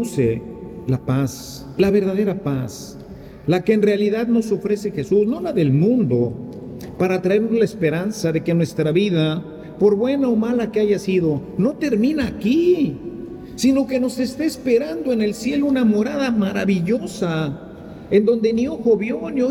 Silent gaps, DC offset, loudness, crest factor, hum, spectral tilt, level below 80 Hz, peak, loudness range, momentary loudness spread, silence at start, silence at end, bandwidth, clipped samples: none; under 0.1%; -19 LUFS; 16 dB; none; -7 dB/octave; -48 dBFS; -4 dBFS; 2 LU; 14 LU; 0 s; 0 s; 16.5 kHz; under 0.1%